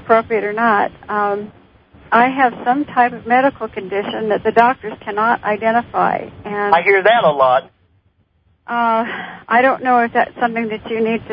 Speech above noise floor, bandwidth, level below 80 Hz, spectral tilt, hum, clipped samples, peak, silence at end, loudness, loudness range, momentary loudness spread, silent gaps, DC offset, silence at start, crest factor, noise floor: 43 dB; 5.2 kHz; -54 dBFS; -8 dB/octave; none; under 0.1%; 0 dBFS; 0 s; -16 LUFS; 2 LU; 10 LU; none; under 0.1%; 0 s; 16 dB; -59 dBFS